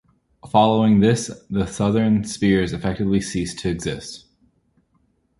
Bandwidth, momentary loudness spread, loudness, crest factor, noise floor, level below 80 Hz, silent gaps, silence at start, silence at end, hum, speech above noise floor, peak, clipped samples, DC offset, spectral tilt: 11.5 kHz; 11 LU; -20 LUFS; 18 dB; -65 dBFS; -44 dBFS; none; 0.45 s; 1.2 s; none; 45 dB; -2 dBFS; under 0.1%; under 0.1%; -6 dB/octave